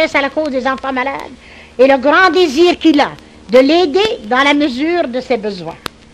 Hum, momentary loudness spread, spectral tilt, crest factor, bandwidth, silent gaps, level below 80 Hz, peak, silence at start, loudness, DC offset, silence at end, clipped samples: none; 15 LU; -4 dB/octave; 12 dB; 13.5 kHz; none; -46 dBFS; 0 dBFS; 0 s; -12 LUFS; under 0.1%; 0.35 s; under 0.1%